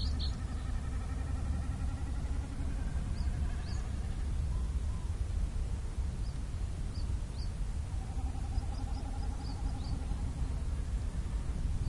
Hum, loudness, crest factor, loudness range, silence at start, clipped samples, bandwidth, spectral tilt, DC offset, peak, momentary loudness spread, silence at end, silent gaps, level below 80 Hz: none; -38 LUFS; 14 dB; 1 LU; 0 s; under 0.1%; 11.5 kHz; -6 dB/octave; under 0.1%; -20 dBFS; 3 LU; 0 s; none; -36 dBFS